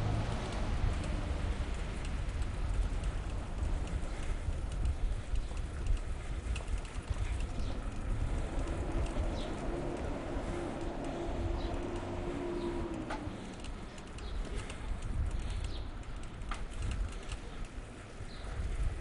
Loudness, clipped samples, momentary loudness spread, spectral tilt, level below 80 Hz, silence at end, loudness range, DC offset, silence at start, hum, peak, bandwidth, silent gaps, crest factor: -40 LUFS; under 0.1%; 8 LU; -6 dB/octave; -38 dBFS; 0 s; 4 LU; under 0.1%; 0 s; none; -20 dBFS; 11 kHz; none; 16 dB